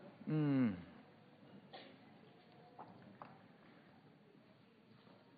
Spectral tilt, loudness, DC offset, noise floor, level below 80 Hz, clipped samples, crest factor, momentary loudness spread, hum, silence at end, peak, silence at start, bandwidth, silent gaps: -7.5 dB/octave; -39 LUFS; under 0.1%; -67 dBFS; -86 dBFS; under 0.1%; 18 dB; 28 LU; none; 2.05 s; -26 dBFS; 0 s; 4.9 kHz; none